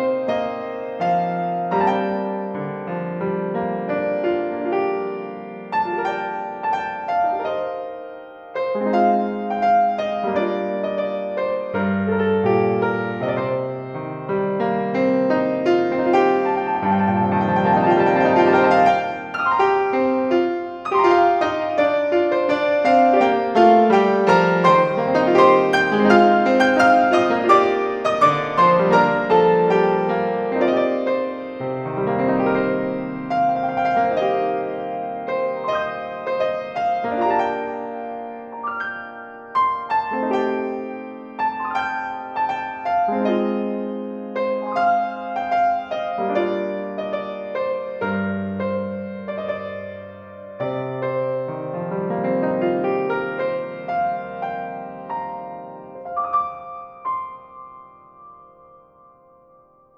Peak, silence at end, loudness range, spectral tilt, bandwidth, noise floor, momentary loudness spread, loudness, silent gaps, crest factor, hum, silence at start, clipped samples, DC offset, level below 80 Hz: -2 dBFS; 1.6 s; 11 LU; -7 dB/octave; 9.2 kHz; -53 dBFS; 13 LU; -20 LUFS; none; 18 dB; none; 0 s; under 0.1%; under 0.1%; -60 dBFS